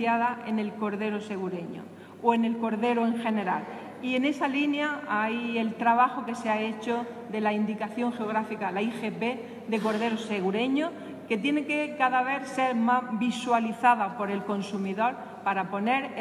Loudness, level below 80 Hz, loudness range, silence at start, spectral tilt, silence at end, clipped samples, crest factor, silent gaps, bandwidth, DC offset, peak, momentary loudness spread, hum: -28 LUFS; -80 dBFS; 3 LU; 0 s; -5.5 dB/octave; 0 s; under 0.1%; 20 dB; none; 12 kHz; under 0.1%; -8 dBFS; 8 LU; none